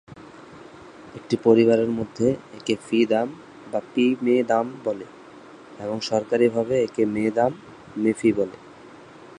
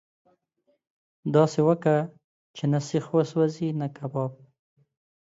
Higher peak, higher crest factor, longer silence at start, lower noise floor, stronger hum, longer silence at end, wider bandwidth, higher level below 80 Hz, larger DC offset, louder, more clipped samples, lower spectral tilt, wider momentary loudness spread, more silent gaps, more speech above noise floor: first, -4 dBFS vs -8 dBFS; about the same, 20 dB vs 18 dB; second, 0.1 s vs 1.25 s; second, -45 dBFS vs -72 dBFS; neither; second, 0.5 s vs 0.9 s; first, 10.5 kHz vs 7.8 kHz; first, -60 dBFS vs -72 dBFS; neither; about the same, -23 LUFS vs -25 LUFS; neither; second, -6 dB/octave vs -7.5 dB/octave; first, 23 LU vs 12 LU; second, none vs 2.24-2.54 s; second, 23 dB vs 48 dB